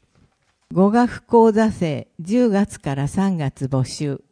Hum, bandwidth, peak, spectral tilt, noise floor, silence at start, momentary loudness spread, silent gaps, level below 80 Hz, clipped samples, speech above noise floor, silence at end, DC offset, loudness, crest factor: none; 10.5 kHz; -4 dBFS; -7 dB/octave; -61 dBFS; 0.7 s; 10 LU; none; -50 dBFS; under 0.1%; 42 dB; 0.15 s; under 0.1%; -19 LUFS; 16 dB